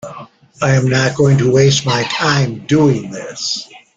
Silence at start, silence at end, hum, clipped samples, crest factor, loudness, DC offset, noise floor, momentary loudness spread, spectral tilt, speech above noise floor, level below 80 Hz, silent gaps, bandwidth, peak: 0.05 s; 0.2 s; none; under 0.1%; 14 dB; -14 LUFS; under 0.1%; -36 dBFS; 10 LU; -5 dB/octave; 22 dB; -46 dBFS; none; 7.8 kHz; 0 dBFS